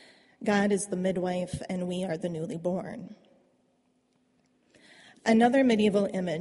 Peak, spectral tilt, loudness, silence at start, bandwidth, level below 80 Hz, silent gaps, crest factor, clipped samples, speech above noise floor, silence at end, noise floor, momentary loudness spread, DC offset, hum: -10 dBFS; -5.5 dB/octave; -28 LUFS; 0.4 s; 11.5 kHz; -64 dBFS; none; 18 dB; under 0.1%; 43 dB; 0 s; -70 dBFS; 13 LU; under 0.1%; none